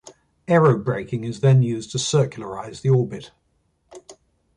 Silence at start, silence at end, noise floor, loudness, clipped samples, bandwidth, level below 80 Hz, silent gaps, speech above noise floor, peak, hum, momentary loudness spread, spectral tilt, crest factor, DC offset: 0.05 s; 0.45 s; -67 dBFS; -20 LUFS; under 0.1%; 10.5 kHz; -56 dBFS; none; 47 dB; -4 dBFS; none; 15 LU; -6 dB/octave; 18 dB; under 0.1%